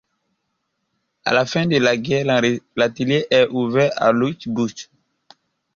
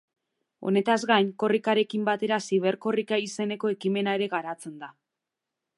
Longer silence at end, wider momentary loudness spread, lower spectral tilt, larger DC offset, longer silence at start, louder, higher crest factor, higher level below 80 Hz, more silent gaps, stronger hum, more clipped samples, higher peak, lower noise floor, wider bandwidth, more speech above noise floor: about the same, 0.95 s vs 0.9 s; second, 7 LU vs 13 LU; about the same, -5.5 dB/octave vs -5 dB/octave; neither; first, 1.25 s vs 0.6 s; first, -19 LUFS vs -26 LUFS; about the same, 18 dB vs 22 dB; first, -58 dBFS vs -82 dBFS; neither; neither; neither; first, -2 dBFS vs -6 dBFS; second, -74 dBFS vs -86 dBFS; second, 7.4 kHz vs 11.5 kHz; second, 55 dB vs 60 dB